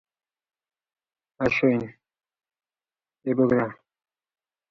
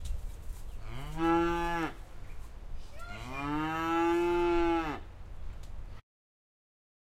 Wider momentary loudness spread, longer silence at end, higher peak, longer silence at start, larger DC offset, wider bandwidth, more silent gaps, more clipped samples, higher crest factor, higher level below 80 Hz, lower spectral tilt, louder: second, 12 LU vs 22 LU; about the same, 0.95 s vs 1 s; first, -8 dBFS vs -18 dBFS; first, 1.4 s vs 0 s; neither; second, 6.6 kHz vs 15 kHz; neither; neither; first, 22 dB vs 16 dB; second, -60 dBFS vs -42 dBFS; first, -8 dB/octave vs -6 dB/octave; first, -24 LUFS vs -31 LUFS